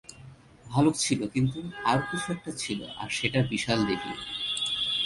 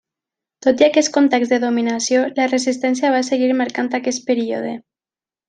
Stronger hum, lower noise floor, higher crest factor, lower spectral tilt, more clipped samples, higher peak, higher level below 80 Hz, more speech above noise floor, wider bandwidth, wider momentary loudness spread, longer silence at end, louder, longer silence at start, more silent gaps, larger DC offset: neither; second, -50 dBFS vs under -90 dBFS; about the same, 20 dB vs 16 dB; about the same, -4 dB/octave vs -3 dB/octave; neither; second, -10 dBFS vs -2 dBFS; first, -56 dBFS vs -66 dBFS; second, 22 dB vs over 73 dB; first, 11.5 kHz vs 9.6 kHz; about the same, 8 LU vs 7 LU; second, 0 s vs 0.7 s; second, -28 LUFS vs -17 LUFS; second, 0.1 s vs 0.65 s; neither; neither